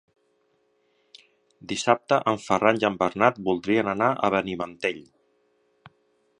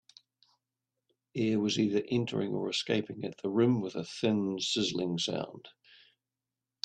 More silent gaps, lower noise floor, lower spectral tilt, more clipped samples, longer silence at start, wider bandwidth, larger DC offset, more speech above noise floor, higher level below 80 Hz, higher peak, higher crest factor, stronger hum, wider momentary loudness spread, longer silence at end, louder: neither; second, -68 dBFS vs -90 dBFS; about the same, -5 dB/octave vs -5 dB/octave; neither; first, 1.65 s vs 1.35 s; about the same, 10.5 kHz vs 9.8 kHz; neither; second, 45 dB vs 59 dB; first, -62 dBFS vs -72 dBFS; first, -2 dBFS vs -14 dBFS; first, 24 dB vs 18 dB; neither; about the same, 9 LU vs 9 LU; first, 1.4 s vs 1.15 s; first, -24 LUFS vs -31 LUFS